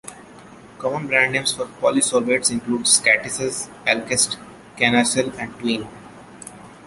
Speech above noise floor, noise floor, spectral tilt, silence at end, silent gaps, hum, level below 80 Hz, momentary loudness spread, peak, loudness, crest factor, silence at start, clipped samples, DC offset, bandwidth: 23 dB; -43 dBFS; -2 dB/octave; 0 s; none; none; -58 dBFS; 18 LU; -2 dBFS; -19 LUFS; 20 dB; 0.05 s; under 0.1%; under 0.1%; 12 kHz